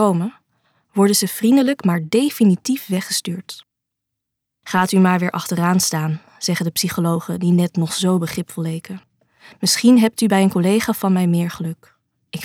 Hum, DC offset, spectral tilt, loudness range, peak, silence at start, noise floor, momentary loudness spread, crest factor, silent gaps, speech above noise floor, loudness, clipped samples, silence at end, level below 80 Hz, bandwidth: none; under 0.1%; -5 dB/octave; 3 LU; -2 dBFS; 0 s; -80 dBFS; 13 LU; 16 dB; none; 63 dB; -18 LUFS; under 0.1%; 0 s; -62 dBFS; 17.5 kHz